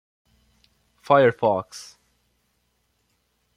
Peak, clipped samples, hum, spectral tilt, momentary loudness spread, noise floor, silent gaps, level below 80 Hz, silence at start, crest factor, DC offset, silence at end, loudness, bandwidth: -4 dBFS; under 0.1%; none; -6 dB/octave; 23 LU; -70 dBFS; none; -68 dBFS; 1.1 s; 22 dB; under 0.1%; 1.75 s; -20 LUFS; 12 kHz